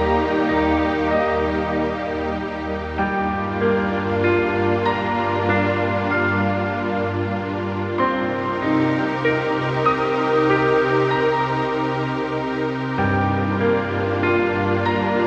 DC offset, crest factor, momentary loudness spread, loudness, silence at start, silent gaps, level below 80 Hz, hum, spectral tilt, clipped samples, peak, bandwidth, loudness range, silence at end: under 0.1%; 16 dB; 5 LU; -20 LUFS; 0 s; none; -42 dBFS; none; -7.5 dB/octave; under 0.1%; -4 dBFS; 8 kHz; 2 LU; 0 s